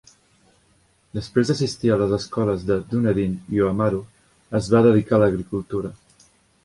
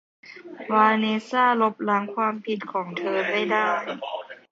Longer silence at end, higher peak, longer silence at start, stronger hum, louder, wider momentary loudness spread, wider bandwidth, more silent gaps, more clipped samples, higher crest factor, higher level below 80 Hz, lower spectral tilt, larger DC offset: first, 0.7 s vs 0.15 s; about the same, -4 dBFS vs -6 dBFS; first, 1.15 s vs 0.25 s; neither; about the same, -21 LUFS vs -23 LUFS; about the same, 13 LU vs 14 LU; first, 11.5 kHz vs 7.6 kHz; neither; neither; about the same, 18 dB vs 18 dB; first, -48 dBFS vs -76 dBFS; first, -7 dB/octave vs -5.5 dB/octave; neither